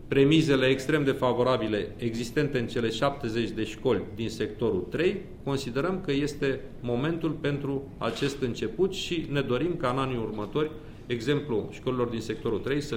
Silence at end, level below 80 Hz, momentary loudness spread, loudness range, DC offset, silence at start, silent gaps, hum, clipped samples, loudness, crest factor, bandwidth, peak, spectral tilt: 0 s; -48 dBFS; 8 LU; 3 LU; under 0.1%; 0 s; none; none; under 0.1%; -28 LUFS; 18 dB; 16 kHz; -10 dBFS; -6 dB/octave